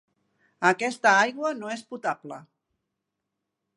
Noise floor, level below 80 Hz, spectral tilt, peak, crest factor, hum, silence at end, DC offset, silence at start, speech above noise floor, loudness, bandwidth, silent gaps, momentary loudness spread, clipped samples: -83 dBFS; -84 dBFS; -3.5 dB/octave; -6 dBFS; 22 dB; none; 1.35 s; under 0.1%; 0.6 s; 58 dB; -24 LUFS; 11.5 kHz; none; 16 LU; under 0.1%